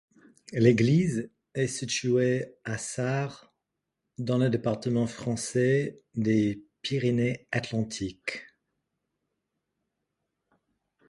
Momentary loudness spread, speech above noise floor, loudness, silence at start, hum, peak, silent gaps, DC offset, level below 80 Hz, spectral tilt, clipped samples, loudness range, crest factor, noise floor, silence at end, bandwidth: 12 LU; 57 dB; -28 LUFS; 0.5 s; none; -8 dBFS; none; under 0.1%; -62 dBFS; -6 dB/octave; under 0.1%; 8 LU; 20 dB; -84 dBFS; 2.65 s; 11.5 kHz